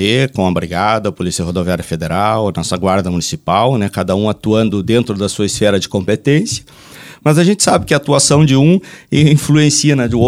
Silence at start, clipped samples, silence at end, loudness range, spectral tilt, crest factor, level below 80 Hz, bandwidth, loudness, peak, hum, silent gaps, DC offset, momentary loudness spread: 0 s; under 0.1%; 0 s; 4 LU; -5 dB/octave; 14 dB; -40 dBFS; 15 kHz; -13 LUFS; 0 dBFS; none; none; under 0.1%; 8 LU